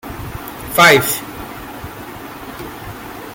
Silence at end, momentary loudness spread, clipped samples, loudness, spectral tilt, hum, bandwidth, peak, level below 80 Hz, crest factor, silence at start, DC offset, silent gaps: 0 s; 22 LU; under 0.1%; -12 LUFS; -3 dB/octave; none; 17 kHz; 0 dBFS; -42 dBFS; 18 dB; 0.05 s; under 0.1%; none